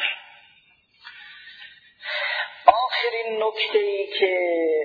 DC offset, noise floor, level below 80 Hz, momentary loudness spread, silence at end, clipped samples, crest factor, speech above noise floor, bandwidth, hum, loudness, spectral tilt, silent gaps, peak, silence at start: under 0.1%; -59 dBFS; -68 dBFS; 23 LU; 0 s; under 0.1%; 24 dB; 36 dB; 5 kHz; none; -22 LUFS; -3.5 dB/octave; none; 0 dBFS; 0 s